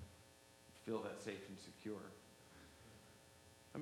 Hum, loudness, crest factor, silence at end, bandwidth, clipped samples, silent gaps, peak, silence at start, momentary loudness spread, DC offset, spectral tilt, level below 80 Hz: none; -52 LUFS; 22 dB; 0 s; 19 kHz; under 0.1%; none; -32 dBFS; 0 s; 18 LU; under 0.1%; -5 dB/octave; -78 dBFS